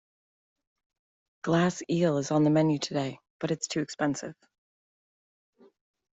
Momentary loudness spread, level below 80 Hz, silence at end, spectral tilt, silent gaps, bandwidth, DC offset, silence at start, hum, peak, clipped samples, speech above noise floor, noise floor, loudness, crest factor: 13 LU; -68 dBFS; 1.8 s; -5.5 dB/octave; 3.30-3.40 s; 8.2 kHz; under 0.1%; 1.45 s; none; -12 dBFS; under 0.1%; over 63 dB; under -90 dBFS; -28 LUFS; 18 dB